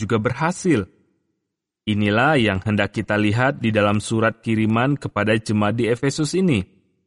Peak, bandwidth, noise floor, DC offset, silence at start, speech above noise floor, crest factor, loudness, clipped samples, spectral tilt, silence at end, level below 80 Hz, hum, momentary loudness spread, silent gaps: -4 dBFS; 11.5 kHz; -79 dBFS; under 0.1%; 0 s; 60 dB; 16 dB; -20 LUFS; under 0.1%; -6 dB/octave; 0.45 s; -52 dBFS; none; 5 LU; none